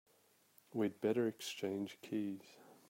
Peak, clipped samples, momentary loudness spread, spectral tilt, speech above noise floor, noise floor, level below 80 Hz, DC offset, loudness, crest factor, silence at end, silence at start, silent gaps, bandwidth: -22 dBFS; under 0.1%; 11 LU; -5.5 dB/octave; 33 dB; -72 dBFS; -88 dBFS; under 0.1%; -41 LUFS; 18 dB; 0.15 s; 0.75 s; none; 16 kHz